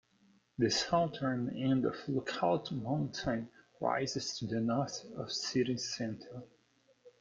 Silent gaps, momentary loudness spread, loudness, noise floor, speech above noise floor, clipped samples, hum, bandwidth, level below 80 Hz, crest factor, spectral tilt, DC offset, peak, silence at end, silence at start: none; 9 LU; -35 LUFS; -71 dBFS; 36 dB; under 0.1%; none; 9 kHz; -68 dBFS; 18 dB; -5 dB/octave; under 0.1%; -18 dBFS; 0.1 s; 0.6 s